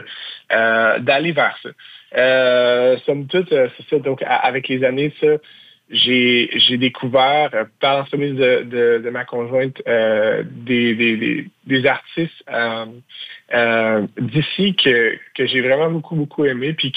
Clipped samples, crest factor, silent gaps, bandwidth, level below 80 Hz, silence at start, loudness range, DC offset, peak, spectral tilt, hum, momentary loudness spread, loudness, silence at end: under 0.1%; 14 dB; none; 5 kHz; -64 dBFS; 0 s; 3 LU; under 0.1%; -2 dBFS; -7.5 dB/octave; none; 10 LU; -17 LUFS; 0.05 s